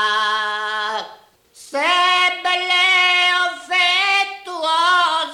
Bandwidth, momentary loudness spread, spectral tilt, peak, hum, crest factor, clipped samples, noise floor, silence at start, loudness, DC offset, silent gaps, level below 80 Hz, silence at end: 16 kHz; 11 LU; 1 dB/octave; -6 dBFS; none; 12 dB; under 0.1%; -47 dBFS; 0 s; -16 LUFS; under 0.1%; none; -66 dBFS; 0 s